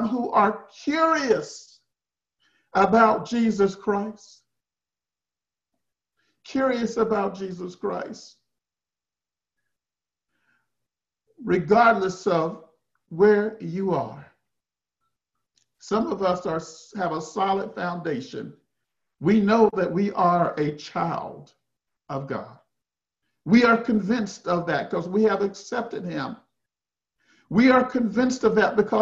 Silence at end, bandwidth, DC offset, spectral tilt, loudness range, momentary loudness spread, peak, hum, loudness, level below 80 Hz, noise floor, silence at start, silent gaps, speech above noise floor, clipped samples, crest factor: 0 s; 8 kHz; under 0.1%; -6 dB/octave; 7 LU; 16 LU; -4 dBFS; none; -23 LUFS; -62 dBFS; under -90 dBFS; 0 s; none; over 67 dB; under 0.1%; 20 dB